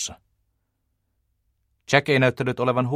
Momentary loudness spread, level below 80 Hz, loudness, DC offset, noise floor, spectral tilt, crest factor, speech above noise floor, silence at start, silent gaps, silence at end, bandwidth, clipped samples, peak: 6 LU; -60 dBFS; -21 LUFS; under 0.1%; -74 dBFS; -5 dB/octave; 24 dB; 53 dB; 0 s; none; 0 s; 14 kHz; under 0.1%; -2 dBFS